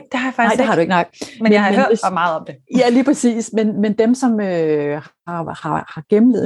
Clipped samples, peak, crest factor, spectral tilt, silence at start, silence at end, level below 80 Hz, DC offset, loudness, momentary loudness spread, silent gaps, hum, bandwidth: under 0.1%; -2 dBFS; 14 dB; -5.5 dB/octave; 0.1 s; 0 s; -62 dBFS; under 0.1%; -16 LUFS; 11 LU; none; none; 11.5 kHz